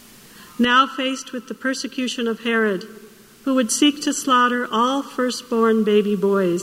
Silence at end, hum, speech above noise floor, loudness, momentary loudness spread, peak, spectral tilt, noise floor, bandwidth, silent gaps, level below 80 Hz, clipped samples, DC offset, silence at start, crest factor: 0 s; none; 25 dB; -20 LUFS; 10 LU; -4 dBFS; -3.5 dB/octave; -45 dBFS; 16 kHz; none; -64 dBFS; under 0.1%; under 0.1%; 0.35 s; 16 dB